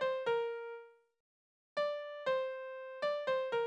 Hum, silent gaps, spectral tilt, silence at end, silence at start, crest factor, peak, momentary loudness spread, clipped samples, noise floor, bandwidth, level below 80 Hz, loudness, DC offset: none; 1.20-1.76 s; -3.5 dB/octave; 0 s; 0 s; 14 dB; -24 dBFS; 10 LU; under 0.1%; under -90 dBFS; 8.4 kHz; -84 dBFS; -38 LUFS; under 0.1%